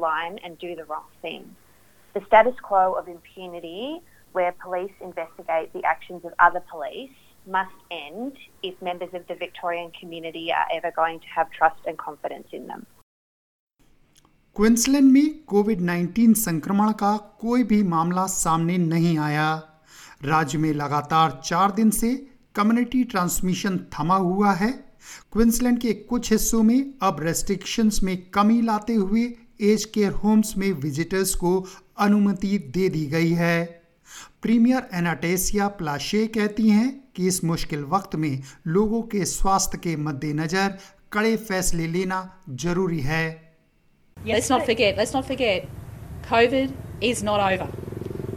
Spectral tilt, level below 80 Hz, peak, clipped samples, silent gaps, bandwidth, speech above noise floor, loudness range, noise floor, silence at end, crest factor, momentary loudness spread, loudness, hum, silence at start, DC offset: -5 dB/octave; -42 dBFS; -2 dBFS; under 0.1%; 13.03-13.67 s; 18 kHz; 38 dB; 6 LU; -61 dBFS; 0 s; 20 dB; 15 LU; -23 LUFS; none; 0 s; under 0.1%